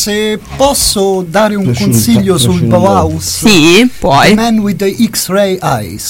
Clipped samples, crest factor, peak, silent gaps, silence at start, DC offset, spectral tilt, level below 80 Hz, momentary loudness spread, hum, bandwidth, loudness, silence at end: 0.4%; 10 dB; 0 dBFS; none; 0 s; under 0.1%; -4.5 dB/octave; -32 dBFS; 6 LU; none; 17 kHz; -9 LUFS; 0 s